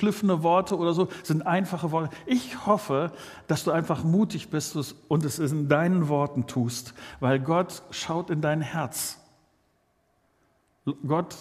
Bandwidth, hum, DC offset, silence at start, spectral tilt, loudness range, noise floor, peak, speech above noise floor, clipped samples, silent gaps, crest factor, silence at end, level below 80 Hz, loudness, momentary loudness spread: 15.5 kHz; none; under 0.1%; 0 s; -6 dB/octave; 5 LU; -69 dBFS; -6 dBFS; 43 dB; under 0.1%; none; 20 dB; 0 s; -64 dBFS; -27 LUFS; 10 LU